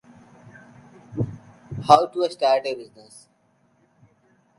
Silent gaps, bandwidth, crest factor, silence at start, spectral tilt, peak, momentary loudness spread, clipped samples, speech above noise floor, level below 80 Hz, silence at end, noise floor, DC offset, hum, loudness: none; 11.5 kHz; 24 dB; 1.1 s; -5.5 dB/octave; 0 dBFS; 21 LU; under 0.1%; 43 dB; -58 dBFS; 1.75 s; -64 dBFS; under 0.1%; none; -21 LUFS